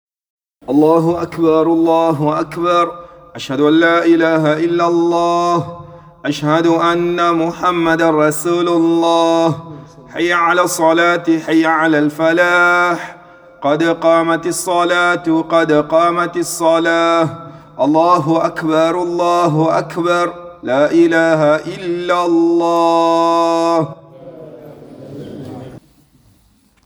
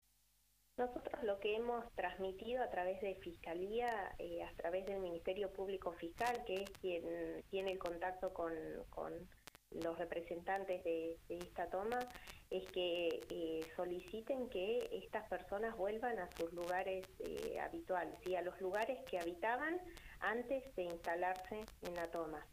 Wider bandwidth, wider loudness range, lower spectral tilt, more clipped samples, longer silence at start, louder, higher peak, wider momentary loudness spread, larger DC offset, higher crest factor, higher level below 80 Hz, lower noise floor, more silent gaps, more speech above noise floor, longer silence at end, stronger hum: first, over 20 kHz vs 15.5 kHz; about the same, 2 LU vs 3 LU; about the same, -5.5 dB/octave vs -4.5 dB/octave; neither; about the same, 0.7 s vs 0.8 s; first, -14 LUFS vs -44 LUFS; first, 0 dBFS vs -26 dBFS; first, 11 LU vs 7 LU; neither; about the same, 14 dB vs 18 dB; first, -54 dBFS vs -66 dBFS; second, -53 dBFS vs -77 dBFS; neither; first, 40 dB vs 33 dB; first, 1.05 s vs 0 s; neither